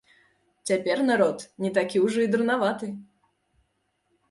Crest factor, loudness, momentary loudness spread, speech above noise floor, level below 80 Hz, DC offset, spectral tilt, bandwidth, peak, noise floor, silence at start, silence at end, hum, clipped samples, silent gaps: 18 dB; -25 LUFS; 13 LU; 49 dB; -72 dBFS; under 0.1%; -5 dB/octave; 11.5 kHz; -8 dBFS; -73 dBFS; 0.65 s; 1.25 s; none; under 0.1%; none